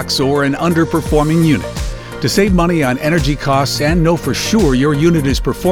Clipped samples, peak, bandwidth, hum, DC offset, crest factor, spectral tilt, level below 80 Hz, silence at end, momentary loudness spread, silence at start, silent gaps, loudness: under 0.1%; 0 dBFS; 18 kHz; none; under 0.1%; 14 dB; -5.5 dB/octave; -26 dBFS; 0 s; 4 LU; 0 s; none; -14 LUFS